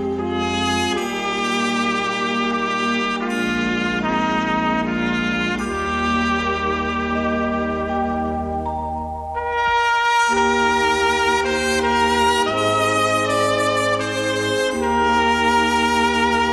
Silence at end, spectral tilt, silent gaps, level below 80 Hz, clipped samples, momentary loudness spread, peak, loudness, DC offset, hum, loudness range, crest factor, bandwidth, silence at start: 0 s; -4 dB/octave; none; -40 dBFS; under 0.1%; 6 LU; -6 dBFS; -19 LUFS; under 0.1%; none; 4 LU; 14 dB; 13.5 kHz; 0 s